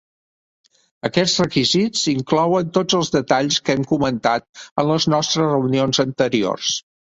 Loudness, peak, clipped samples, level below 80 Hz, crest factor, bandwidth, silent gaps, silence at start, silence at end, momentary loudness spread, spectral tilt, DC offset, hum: -18 LUFS; -2 dBFS; under 0.1%; -54 dBFS; 18 dB; 8.2 kHz; 4.49-4.53 s, 4.71-4.76 s; 1.05 s; 0.25 s; 5 LU; -4.5 dB/octave; under 0.1%; none